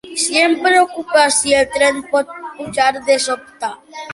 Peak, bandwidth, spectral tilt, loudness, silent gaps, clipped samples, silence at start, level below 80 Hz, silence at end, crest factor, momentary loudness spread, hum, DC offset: -2 dBFS; 11.5 kHz; -1 dB/octave; -15 LUFS; none; under 0.1%; 0.05 s; -52 dBFS; 0 s; 14 dB; 14 LU; none; under 0.1%